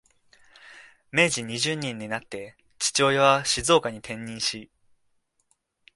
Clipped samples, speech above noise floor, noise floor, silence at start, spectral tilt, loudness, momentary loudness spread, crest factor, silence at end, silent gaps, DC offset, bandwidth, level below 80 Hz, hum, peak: under 0.1%; 46 dB; -71 dBFS; 0.65 s; -2.5 dB/octave; -24 LUFS; 17 LU; 22 dB; 1.3 s; none; under 0.1%; 12 kHz; -58 dBFS; none; -4 dBFS